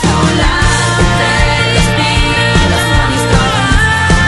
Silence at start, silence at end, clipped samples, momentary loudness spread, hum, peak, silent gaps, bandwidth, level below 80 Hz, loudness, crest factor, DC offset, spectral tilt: 0 s; 0 s; under 0.1%; 1 LU; none; 0 dBFS; none; 12.5 kHz; -16 dBFS; -10 LUFS; 10 dB; under 0.1%; -4.5 dB/octave